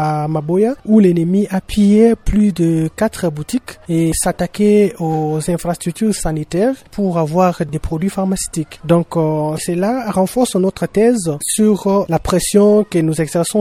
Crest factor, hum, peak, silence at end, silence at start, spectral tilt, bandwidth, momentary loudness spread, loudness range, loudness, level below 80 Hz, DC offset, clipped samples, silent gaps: 14 dB; none; 0 dBFS; 0 s; 0 s; -6 dB/octave; 15.5 kHz; 8 LU; 3 LU; -15 LUFS; -34 dBFS; under 0.1%; under 0.1%; none